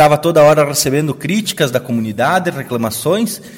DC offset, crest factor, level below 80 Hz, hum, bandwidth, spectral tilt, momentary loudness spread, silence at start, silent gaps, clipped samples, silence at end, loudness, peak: under 0.1%; 14 dB; -50 dBFS; none; 17 kHz; -4.5 dB/octave; 9 LU; 0 s; none; under 0.1%; 0 s; -14 LUFS; 0 dBFS